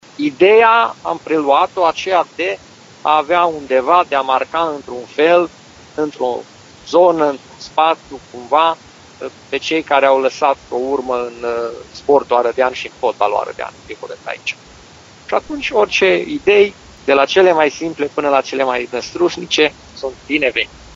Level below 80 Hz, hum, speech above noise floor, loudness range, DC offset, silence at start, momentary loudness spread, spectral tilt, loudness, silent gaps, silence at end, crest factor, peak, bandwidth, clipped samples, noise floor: -52 dBFS; none; 26 dB; 4 LU; under 0.1%; 0.2 s; 15 LU; -1.5 dB/octave; -15 LUFS; none; 0.05 s; 16 dB; 0 dBFS; 7.8 kHz; under 0.1%; -41 dBFS